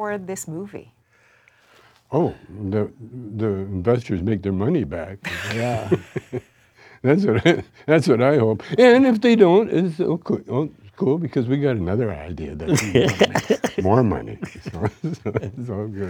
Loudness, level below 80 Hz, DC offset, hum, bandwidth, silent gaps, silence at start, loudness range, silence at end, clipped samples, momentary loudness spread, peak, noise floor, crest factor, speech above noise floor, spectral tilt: -20 LUFS; -48 dBFS; under 0.1%; none; 19 kHz; none; 0 s; 9 LU; 0 s; under 0.1%; 16 LU; 0 dBFS; -58 dBFS; 20 dB; 38 dB; -6.5 dB/octave